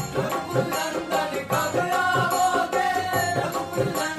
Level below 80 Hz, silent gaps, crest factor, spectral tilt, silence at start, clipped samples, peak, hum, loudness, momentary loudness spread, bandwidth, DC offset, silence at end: -56 dBFS; none; 16 dB; -4 dB/octave; 0 s; under 0.1%; -8 dBFS; none; -24 LUFS; 5 LU; 15.5 kHz; under 0.1%; 0 s